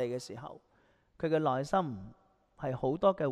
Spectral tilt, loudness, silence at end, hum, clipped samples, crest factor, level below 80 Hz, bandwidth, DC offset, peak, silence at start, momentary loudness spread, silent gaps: -7 dB/octave; -33 LUFS; 0 s; none; under 0.1%; 20 dB; -64 dBFS; 12.5 kHz; under 0.1%; -14 dBFS; 0 s; 17 LU; none